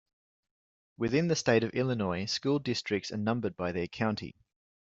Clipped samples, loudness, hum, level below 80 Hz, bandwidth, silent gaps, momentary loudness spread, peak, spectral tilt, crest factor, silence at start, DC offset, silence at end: under 0.1%; -31 LUFS; none; -66 dBFS; 8 kHz; none; 7 LU; -10 dBFS; -5.5 dB/octave; 22 dB; 1 s; under 0.1%; 0.65 s